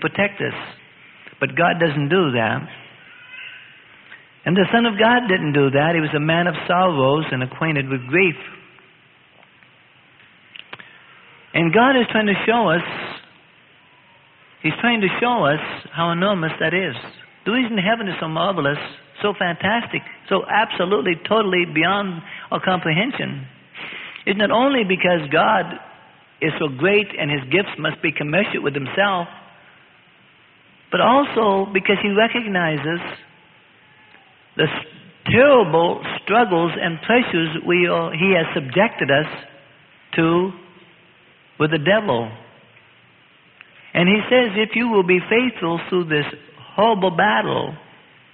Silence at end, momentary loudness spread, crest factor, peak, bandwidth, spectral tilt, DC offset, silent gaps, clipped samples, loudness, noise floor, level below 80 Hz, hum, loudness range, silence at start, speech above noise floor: 0.55 s; 14 LU; 20 dB; 0 dBFS; 4.5 kHz; -10.5 dB/octave; under 0.1%; none; under 0.1%; -19 LUFS; -52 dBFS; -58 dBFS; none; 4 LU; 0 s; 34 dB